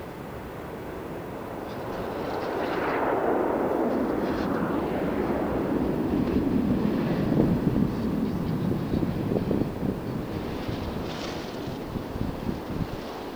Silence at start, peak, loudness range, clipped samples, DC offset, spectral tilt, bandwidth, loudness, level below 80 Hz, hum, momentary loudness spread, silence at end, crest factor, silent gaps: 0 s; -8 dBFS; 6 LU; under 0.1%; under 0.1%; -7.5 dB/octave; 20 kHz; -28 LUFS; -44 dBFS; none; 11 LU; 0 s; 20 dB; none